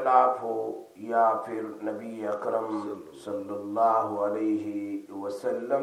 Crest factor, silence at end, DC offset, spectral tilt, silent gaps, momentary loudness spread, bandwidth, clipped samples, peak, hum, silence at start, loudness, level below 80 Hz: 20 dB; 0 s; under 0.1%; -6.5 dB/octave; none; 12 LU; 14 kHz; under 0.1%; -8 dBFS; none; 0 s; -29 LUFS; -82 dBFS